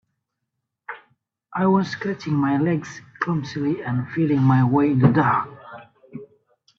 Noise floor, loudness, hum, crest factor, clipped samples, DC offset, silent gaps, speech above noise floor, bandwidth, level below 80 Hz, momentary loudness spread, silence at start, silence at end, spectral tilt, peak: -80 dBFS; -21 LUFS; none; 20 dB; under 0.1%; under 0.1%; none; 60 dB; 7 kHz; -60 dBFS; 24 LU; 0.9 s; 0.55 s; -8.5 dB/octave; -2 dBFS